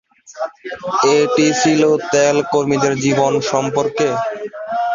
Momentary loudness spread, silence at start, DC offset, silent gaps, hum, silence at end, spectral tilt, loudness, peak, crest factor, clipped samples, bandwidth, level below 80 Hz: 13 LU; 0.3 s; under 0.1%; none; none; 0 s; -4.5 dB/octave; -16 LUFS; -2 dBFS; 14 dB; under 0.1%; 7.6 kHz; -58 dBFS